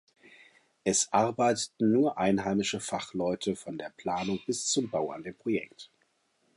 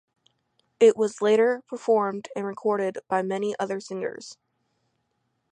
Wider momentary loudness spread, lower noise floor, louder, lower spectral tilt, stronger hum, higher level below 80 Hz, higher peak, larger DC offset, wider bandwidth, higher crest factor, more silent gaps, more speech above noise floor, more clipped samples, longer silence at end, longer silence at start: second, 10 LU vs 13 LU; about the same, -72 dBFS vs -75 dBFS; second, -30 LUFS vs -25 LUFS; about the same, -4 dB/octave vs -5 dB/octave; neither; first, -66 dBFS vs -80 dBFS; second, -12 dBFS vs -6 dBFS; neither; first, 11.5 kHz vs 10 kHz; about the same, 18 dB vs 20 dB; neither; second, 43 dB vs 51 dB; neither; second, 0.7 s vs 1.2 s; about the same, 0.85 s vs 0.8 s